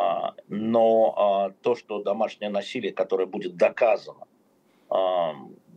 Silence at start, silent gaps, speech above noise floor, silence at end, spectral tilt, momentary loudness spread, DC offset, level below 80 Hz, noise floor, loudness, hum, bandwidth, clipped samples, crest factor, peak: 0 s; none; 39 dB; 0.25 s; -6 dB/octave; 10 LU; under 0.1%; -86 dBFS; -63 dBFS; -25 LUFS; none; 8.6 kHz; under 0.1%; 18 dB; -8 dBFS